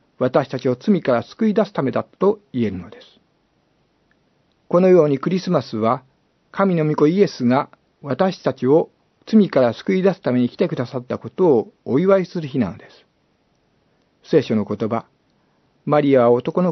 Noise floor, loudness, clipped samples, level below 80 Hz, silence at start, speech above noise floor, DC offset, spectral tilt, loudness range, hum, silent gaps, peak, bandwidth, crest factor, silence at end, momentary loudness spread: -63 dBFS; -19 LUFS; under 0.1%; -66 dBFS; 0.2 s; 45 dB; under 0.1%; -8 dB/octave; 5 LU; none; none; -2 dBFS; 6.2 kHz; 18 dB; 0 s; 11 LU